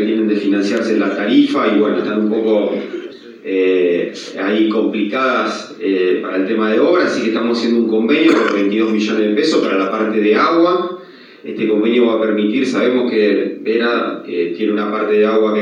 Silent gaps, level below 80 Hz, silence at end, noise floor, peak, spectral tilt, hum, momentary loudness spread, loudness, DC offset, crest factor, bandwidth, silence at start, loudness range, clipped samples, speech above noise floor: none; -86 dBFS; 0 s; -37 dBFS; 0 dBFS; -5.5 dB/octave; none; 8 LU; -15 LUFS; under 0.1%; 14 dB; 9.6 kHz; 0 s; 3 LU; under 0.1%; 22 dB